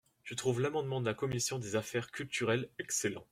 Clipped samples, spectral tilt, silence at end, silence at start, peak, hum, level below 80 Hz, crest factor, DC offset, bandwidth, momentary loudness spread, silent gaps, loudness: under 0.1%; -4 dB/octave; 0.1 s; 0.25 s; -18 dBFS; none; -68 dBFS; 18 dB; under 0.1%; 16.5 kHz; 5 LU; none; -35 LUFS